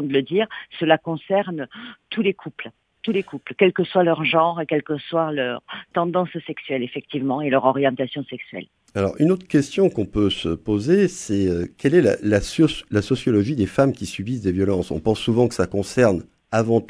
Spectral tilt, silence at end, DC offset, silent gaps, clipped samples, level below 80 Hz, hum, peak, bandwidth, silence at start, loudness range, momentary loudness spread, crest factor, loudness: -6 dB/octave; 0.05 s; under 0.1%; none; under 0.1%; -48 dBFS; none; -2 dBFS; 11 kHz; 0 s; 4 LU; 12 LU; 18 dB; -21 LUFS